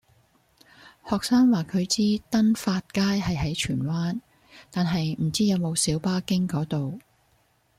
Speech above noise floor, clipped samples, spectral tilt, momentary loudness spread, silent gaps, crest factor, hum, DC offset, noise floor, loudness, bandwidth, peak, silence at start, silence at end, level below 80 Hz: 41 dB; under 0.1%; -5 dB/octave; 9 LU; none; 14 dB; none; under 0.1%; -65 dBFS; -25 LUFS; 15.5 kHz; -10 dBFS; 0.85 s; 0.8 s; -52 dBFS